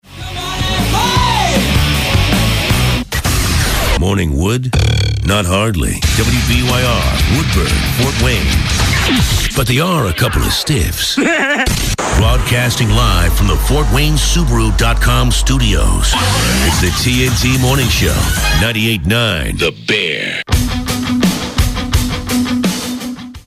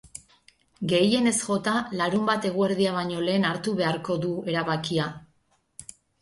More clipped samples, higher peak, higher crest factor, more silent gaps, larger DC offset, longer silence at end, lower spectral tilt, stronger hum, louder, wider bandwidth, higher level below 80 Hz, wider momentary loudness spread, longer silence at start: neither; first, 0 dBFS vs -10 dBFS; about the same, 12 dB vs 16 dB; neither; neither; second, 0.05 s vs 0.4 s; about the same, -4 dB/octave vs -4.5 dB/octave; neither; first, -13 LUFS vs -25 LUFS; first, 16 kHz vs 11.5 kHz; first, -18 dBFS vs -62 dBFS; second, 4 LU vs 20 LU; about the same, 0.1 s vs 0.15 s